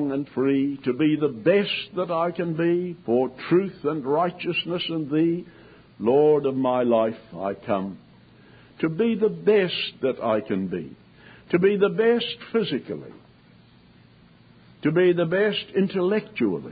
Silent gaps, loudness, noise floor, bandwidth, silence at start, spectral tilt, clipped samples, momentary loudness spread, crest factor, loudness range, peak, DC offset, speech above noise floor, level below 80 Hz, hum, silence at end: none; -23 LUFS; -53 dBFS; 5 kHz; 0 s; -11 dB/octave; under 0.1%; 8 LU; 16 dB; 2 LU; -8 dBFS; under 0.1%; 30 dB; -64 dBFS; none; 0 s